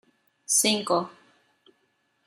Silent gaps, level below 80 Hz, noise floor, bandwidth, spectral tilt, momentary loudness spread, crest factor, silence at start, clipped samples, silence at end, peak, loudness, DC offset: none; -76 dBFS; -71 dBFS; 15.5 kHz; -1.5 dB/octave; 20 LU; 20 dB; 0.5 s; under 0.1%; 1.15 s; -8 dBFS; -23 LUFS; under 0.1%